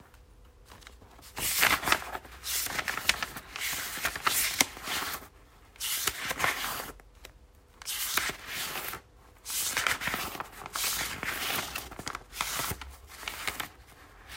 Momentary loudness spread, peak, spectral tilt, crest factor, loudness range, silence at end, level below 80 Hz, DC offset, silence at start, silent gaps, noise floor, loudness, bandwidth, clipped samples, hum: 15 LU; -2 dBFS; -0.5 dB/octave; 32 dB; 4 LU; 0 s; -54 dBFS; under 0.1%; 0 s; none; -57 dBFS; -31 LUFS; 16 kHz; under 0.1%; none